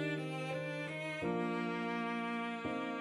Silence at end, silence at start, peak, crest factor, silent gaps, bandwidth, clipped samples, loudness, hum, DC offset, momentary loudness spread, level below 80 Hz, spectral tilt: 0 s; 0 s; -26 dBFS; 12 dB; none; 12.5 kHz; under 0.1%; -39 LUFS; none; under 0.1%; 3 LU; -74 dBFS; -6.5 dB/octave